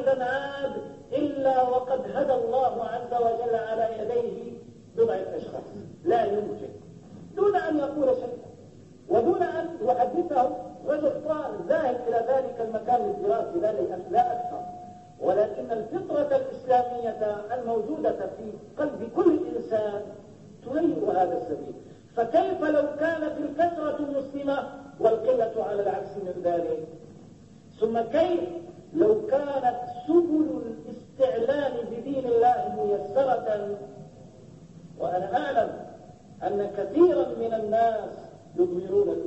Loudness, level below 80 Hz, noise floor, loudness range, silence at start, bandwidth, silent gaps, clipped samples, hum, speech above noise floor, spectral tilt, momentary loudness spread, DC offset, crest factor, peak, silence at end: -27 LUFS; -62 dBFS; -50 dBFS; 3 LU; 0 s; 8.2 kHz; none; under 0.1%; none; 24 dB; -7.5 dB/octave; 15 LU; under 0.1%; 18 dB; -10 dBFS; 0 s